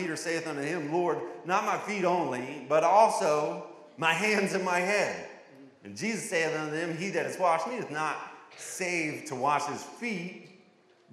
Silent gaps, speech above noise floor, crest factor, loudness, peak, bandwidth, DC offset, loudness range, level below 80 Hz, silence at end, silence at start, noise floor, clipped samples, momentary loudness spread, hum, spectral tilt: none; 32 dB; 20 dB; -29 LUFS; -10 dBFS; 15 kHz; under 0.1%; 5 LU; -86 dBFS; 0.6 s; 0 s; -61 dBFS; under 0.1%; 14 LU; none; -4 dB/octave